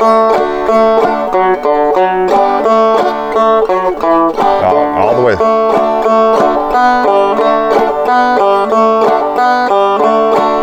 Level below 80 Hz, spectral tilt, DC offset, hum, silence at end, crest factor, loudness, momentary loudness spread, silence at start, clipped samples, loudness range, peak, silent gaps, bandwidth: -40 dBFS; -5.5 dB/octave; under 0.1%; none; 0 s; 10 dB; -10 LUFS; 2 LU; 0 s; under 0.1%; 1 LU; 0 dBFS; none; 15.5 kHz